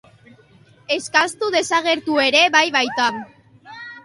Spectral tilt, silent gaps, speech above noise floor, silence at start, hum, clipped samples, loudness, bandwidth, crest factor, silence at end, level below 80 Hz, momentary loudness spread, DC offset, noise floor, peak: -1.5 dB/octave; none; 33 dB; 0.9 s; none; under 0.1%; -17 LUFS; 11.5 kHz; 18 dB; 0.05 s; -66 dBFS; 14 LU; under 0.1%; -51 dBFS; -2 dBFS